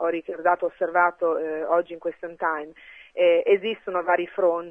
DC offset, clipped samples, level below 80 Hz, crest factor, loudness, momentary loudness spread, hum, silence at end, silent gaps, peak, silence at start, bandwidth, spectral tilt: under 0.1%; under 0.1%; -70 dBFS; 18 dB; -24 LUFS; 12 LU; none; 0 s; none; -6 dBFS; 0 s; 3.6 kHz; -6.5 dB/octave